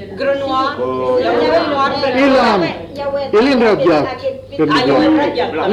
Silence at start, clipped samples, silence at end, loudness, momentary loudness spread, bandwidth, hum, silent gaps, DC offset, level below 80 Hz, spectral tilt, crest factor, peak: 0 s; under 0.1%; 0 s; -14 LUFS; 9 LU; 11 kHz; none; none; under 0.1%; -44 dBFS; -6 dB/octave; 12 dB; -2 dBFS